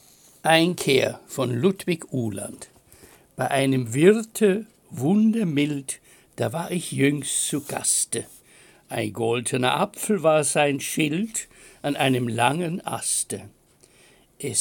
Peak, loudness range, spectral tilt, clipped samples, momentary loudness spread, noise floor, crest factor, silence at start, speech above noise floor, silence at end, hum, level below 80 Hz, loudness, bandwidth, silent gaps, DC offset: -4 dBFS; 3 LU; -4 dB/octave; under 0.1%; 12 LU; -56 dBFS; 20 dB; 0.45 s; 33 dB; 0 s; none; -66 dBFS; -23 LUFS; 17 kHz; none; under 0.1%